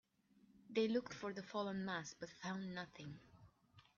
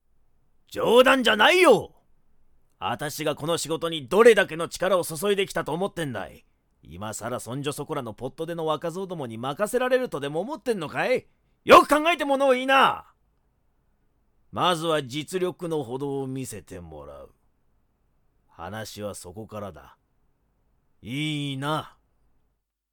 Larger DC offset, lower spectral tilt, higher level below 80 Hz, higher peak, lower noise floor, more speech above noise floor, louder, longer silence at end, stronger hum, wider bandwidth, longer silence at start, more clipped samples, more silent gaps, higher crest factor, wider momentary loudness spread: neither; about the same, -4.5 dB/octave vs -4 dB/octave; second, -80 dBFS vs -58 dBFS; second, -26 dBFS vs -4 dBFS; about the same, -73 dBFS vs -74 dBFS; second, 29 dB vs 50 dB; second, -45 LUFS vs -23 LUFS; second, 0.15 s vs 1.05 s; neither; second, 7.2 kHz vs 19 kHz; second, 0.55 s vs 0.7 s; neither; neither; about the same, 20 dB vs 22 dB; second, 14 LU vs 21 LU